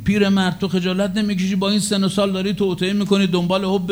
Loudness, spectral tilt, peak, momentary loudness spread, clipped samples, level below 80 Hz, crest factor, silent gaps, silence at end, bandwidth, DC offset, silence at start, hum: -19 LUFS; -5.5 dB/octave; -4 dBFS; 3 LU; under 0.1%; -46 dBFS; 16 dB; none; 0 s; over 20 kHz; under 0.1%; 0 s; none